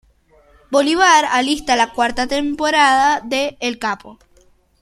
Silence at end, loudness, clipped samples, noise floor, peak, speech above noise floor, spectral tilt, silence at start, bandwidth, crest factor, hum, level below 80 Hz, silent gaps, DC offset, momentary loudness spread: 0.65 s; -16 LUFS; under 0.1%; -53 dBFS; 0 dBFS; 37 dB; -1.5 dB/octave; 0.7 s; 15 kHz; 18 dB; none; -48 dBFS; none; under 0.1%; 10 LU